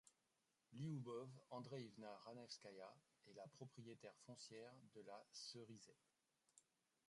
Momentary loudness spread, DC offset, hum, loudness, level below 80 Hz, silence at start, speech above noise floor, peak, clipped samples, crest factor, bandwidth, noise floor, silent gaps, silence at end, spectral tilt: 11 LU; under 0.1%; none; -58 LUFS; under -90 dBFS; 0.05 s; 29 dB; -42 dBFS; under 0.1%; 18 dB; 11 kHz; -88 dBFS; none; 0.45 s; -5 dB/octave